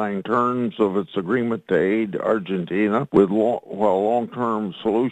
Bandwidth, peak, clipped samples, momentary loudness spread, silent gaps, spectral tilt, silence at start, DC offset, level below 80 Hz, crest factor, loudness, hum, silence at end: 8.8 kHz; -2 dBFS; under 0.1%; 6 LU; none; -8.5 dB/octave; 0 s; under 0.1%; -60 dBFS; 18 dB; -21 LUFS; none; 0 s